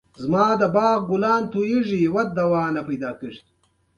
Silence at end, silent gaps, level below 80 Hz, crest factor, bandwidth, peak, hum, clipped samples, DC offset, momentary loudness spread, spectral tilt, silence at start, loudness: 0.6 s; none; -58 dBFS; 16 dB; 11 kHz; -6 dBFS; none; under 0.1%; under 0.1%; 10 LU; -7.5 dB/octave; 0.2 s; -21 LUFS